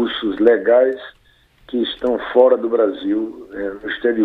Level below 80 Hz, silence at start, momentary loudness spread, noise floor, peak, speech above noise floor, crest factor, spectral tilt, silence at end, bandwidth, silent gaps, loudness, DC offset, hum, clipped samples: -52 dBFS; 0 s; 13 LU; -54 dBFS; 0 dBFS; 37 dB; 16 dB; -6.5 dB/octave; 0 s; 4.5 kHz; none; -18 LUFS; under 0.1%; none; under 0.1%